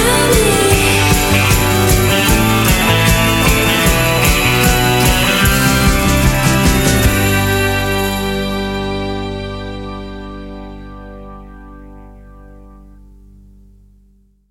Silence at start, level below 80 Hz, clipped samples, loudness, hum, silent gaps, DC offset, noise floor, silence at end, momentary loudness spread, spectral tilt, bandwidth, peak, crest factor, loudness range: 0 s; -22 dBFS; under 0.1%; -12 LUFS; 50 Hz at -35 dBFS; none; under 0.1%; -51 dBFS; 1.8 s; 18 LU; -4 dB/octave; 17 kHz; 0 dBFS; 14 dB; 16 LU